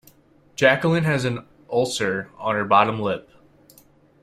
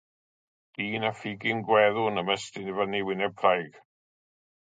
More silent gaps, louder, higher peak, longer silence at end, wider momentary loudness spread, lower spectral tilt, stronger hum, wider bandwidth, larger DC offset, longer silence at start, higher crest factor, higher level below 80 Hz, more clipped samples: neither; first, -21 LUFS vs -27 LUFS; first, -2 dBFS vs -6 dBFS; about the same, 1 s vs 0.95 s; about the same, 10 LU vs 11 LU; about the same, -5 dB/octave vs -5 dB/octave; neither; first, 15 kHz vs 9.4 kHz; neither; second, 0.6 s vs 0.8 s; about the same, 20 dB vs 22 dB; first, -58 dBFS vs -70 dBFS; neither